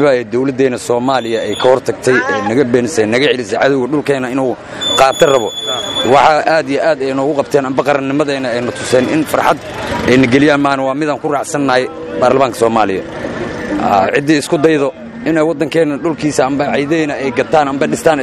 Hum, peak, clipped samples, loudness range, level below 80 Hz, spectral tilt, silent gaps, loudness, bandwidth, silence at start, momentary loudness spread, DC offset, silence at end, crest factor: none; 0 dBFS; 0.1%; 2 LU; -44 dBFS; -4.5 dB/octave; none; -13 LUFS; 15 kHz; 0 s; 7 LU; under 0.1%; 0 s; 12 dB